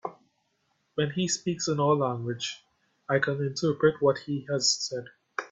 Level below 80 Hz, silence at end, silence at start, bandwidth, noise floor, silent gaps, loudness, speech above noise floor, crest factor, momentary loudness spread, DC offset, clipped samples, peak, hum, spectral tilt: -68 dBFS; 0.05 s; 0.05 s; 8.4 kHz; -74 dBFS; none; -28 LUFS; 46 dB; 20 dB; 13 LU; under 0.1%; under 0.1%; -10 dBFS; none; -4 dB/octave